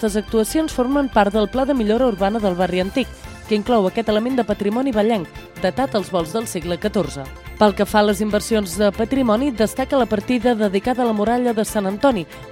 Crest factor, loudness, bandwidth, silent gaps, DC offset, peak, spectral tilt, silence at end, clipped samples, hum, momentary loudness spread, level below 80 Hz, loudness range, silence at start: 18 dB; -19 LUFS; 16.5 kHz; none; under 0.1%; 0 dBFS; -5.5 dB/octave; 0 s; under 0.1%; none; 7 LU; -40 dBFS; 2 LU; 0 s